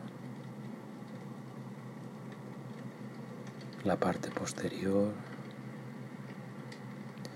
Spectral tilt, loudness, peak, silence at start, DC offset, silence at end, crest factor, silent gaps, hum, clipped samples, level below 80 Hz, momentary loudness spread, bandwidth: -6 dB/octave; -40 LUFS; -16 dBFS; 0 s; under 0.1%; 0 s; 24 dB; none; none; under 0.1%; -76 dBFS; 14 LU; 16 kHz